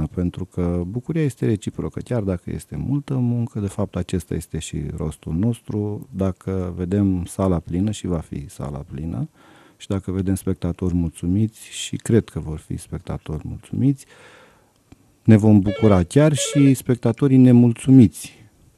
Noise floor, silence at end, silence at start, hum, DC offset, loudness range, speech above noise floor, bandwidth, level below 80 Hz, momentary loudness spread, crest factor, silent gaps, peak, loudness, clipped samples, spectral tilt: -54 dBFS; 0.5 s; 0 s; none; under 0.1%; 10 LU; 35 dB; 13.5 kHz; -42 dBFS; 17 LU; 20 dB; none; 0 dBFS; -21 LUFS; under 0.1%; -7 dB/octave